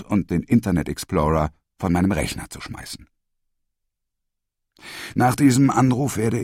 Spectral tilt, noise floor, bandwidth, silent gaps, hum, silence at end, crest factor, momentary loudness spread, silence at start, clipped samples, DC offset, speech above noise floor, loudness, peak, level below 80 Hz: -6 dB/octave; -79 dBFS; 16 kHz; none; none; 0 s; 18 dB; 18 LU; 0 s; under 0.1%; under 0.1%; 59 dB; -20 LUFS; -4 dBFS; -40 dBFS